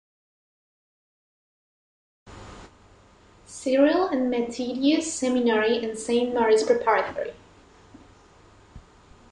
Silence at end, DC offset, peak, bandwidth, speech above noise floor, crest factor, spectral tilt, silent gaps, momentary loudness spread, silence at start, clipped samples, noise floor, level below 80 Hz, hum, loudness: 0.5 s; under 0.1%; -6 dBFS; 11 kHz; 32 dB; 20 dB; -3.5 dB/octave; none; 15 LU; 2.25 s; under 0.1%; -54 dBFS; -58 dBFS; none; -23 LUFS